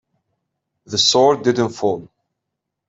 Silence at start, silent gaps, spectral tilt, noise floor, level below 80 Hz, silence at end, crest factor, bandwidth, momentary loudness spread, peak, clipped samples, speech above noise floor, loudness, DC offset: 0.9 s; none; -3.5 dB/octave; -80 dBFS; -62 dBFS; 0.8 s; 18 dB; 8.2 kHz; 10 LU; -2 dBFS; under 0.1%; 63 dB; -16 LUFS; under 0.1%